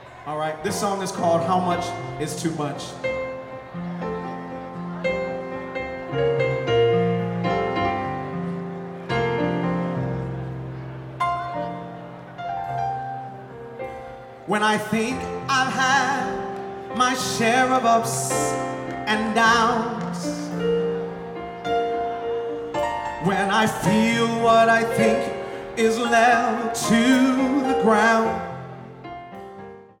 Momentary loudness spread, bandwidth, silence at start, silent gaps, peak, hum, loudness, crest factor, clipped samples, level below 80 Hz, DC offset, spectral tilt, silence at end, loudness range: 16 LU; 17 kHz; 0 s; none; -6 dBFS; none; -22 LUFS; 18 dB; under 0.1%; -52 dBFS; under 0.1%; -4.5 dB/octave; 0.15 s; 10 LU